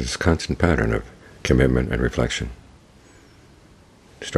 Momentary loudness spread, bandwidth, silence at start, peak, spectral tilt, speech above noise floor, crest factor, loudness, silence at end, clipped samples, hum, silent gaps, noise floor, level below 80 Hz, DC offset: 14 LU; 13 kHz; 0 s; 0 dBFS; -5.5 dB/octave; 30 dB; 22 dB; -22 LUFS; 0 s; under 0.1%; none; none; -51 dBFS; -32 dBFS; under 0.1%